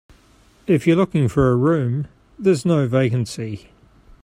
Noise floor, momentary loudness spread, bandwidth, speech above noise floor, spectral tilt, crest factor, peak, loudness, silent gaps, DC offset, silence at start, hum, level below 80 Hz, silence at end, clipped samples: -53 dBFS; 14 LU; 13.5 kHz; 35 dB; -7.5 dB/octave; 16 dB; -4 dBFS; -19 LUFS; none; under 0.1%; 0.7 s; none; -46 dBFS; 0.65 s; under 0.1%